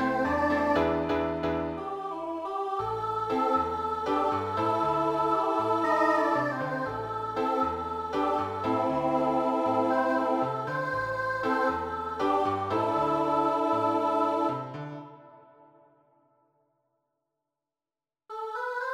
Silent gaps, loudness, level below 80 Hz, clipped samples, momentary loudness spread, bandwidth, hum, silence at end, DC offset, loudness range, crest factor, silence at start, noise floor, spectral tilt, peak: none; -28 LUFS; -56 dBFS; under 0.1%; 8 LU; 15.5 kHz; none; 0 s; under 0.1%; 5 LU; 16 dB; 0 s; under -90 dBFS; -6.5 dB/octave; -12 dBFS